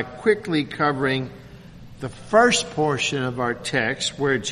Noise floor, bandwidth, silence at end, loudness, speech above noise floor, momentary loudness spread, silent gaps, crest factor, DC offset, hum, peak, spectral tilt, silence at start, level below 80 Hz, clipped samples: -42 dBFS; 11.5 kHz; 0 s; -22 LUFS; 20 dB; 12 LU; none; 20 dB; under 0.1%; none; -4 dBFS; -4 dB/octave; 0 s; -52 dBFS; under 0.1%